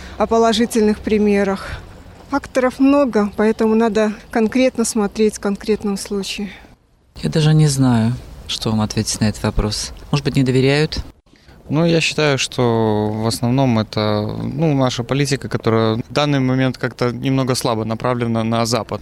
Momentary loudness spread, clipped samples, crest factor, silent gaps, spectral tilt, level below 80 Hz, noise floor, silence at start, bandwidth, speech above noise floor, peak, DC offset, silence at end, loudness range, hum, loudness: 8 LU; under 0.1%; 12 dB; none; -5.5 dB/octave; -38 dBFS; -50 dBFS; 0 s; 15.5 kHz; 33 dB; -4 dBFS; under 0.1%; 0 s; 2 LU; none; -17 LUFS